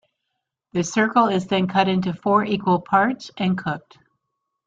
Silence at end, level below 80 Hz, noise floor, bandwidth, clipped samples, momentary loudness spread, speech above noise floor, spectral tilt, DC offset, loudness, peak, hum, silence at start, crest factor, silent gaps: 0.9 s; -60 dBFS; -79 dBFS; 7.8 kHz; under 0.1%; 8 LU; 59 dB; -5.5 dB/octave; under 0.1%; -21 LUFS; -4 dBFS; none; 0.75 s; 18 dB; none